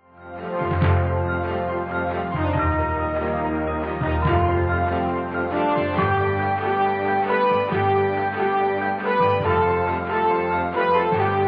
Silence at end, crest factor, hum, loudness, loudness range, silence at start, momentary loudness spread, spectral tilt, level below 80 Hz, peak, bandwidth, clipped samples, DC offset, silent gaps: 0 s; 14 dB; none; -22 LUFS; 2 LU; 0.2 s; 5 LU; -10 dB/octave; -38 dBFS; -8 dBFS; 5.2 kHz; under 0.1%; under 0.1%; none